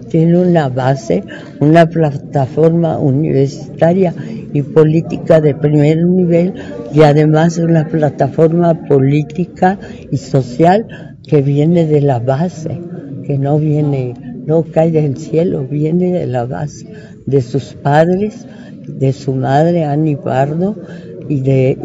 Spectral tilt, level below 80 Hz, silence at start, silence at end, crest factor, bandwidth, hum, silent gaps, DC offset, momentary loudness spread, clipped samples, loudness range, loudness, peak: -8.5 dB/octave; -46 dBFS; 0 s; 0 s; 12 dB; 7.8 kHz; none; none; under 0.1%; 13 LU; 0.4%; 4 LU; -13 LUFS; 0 dBFS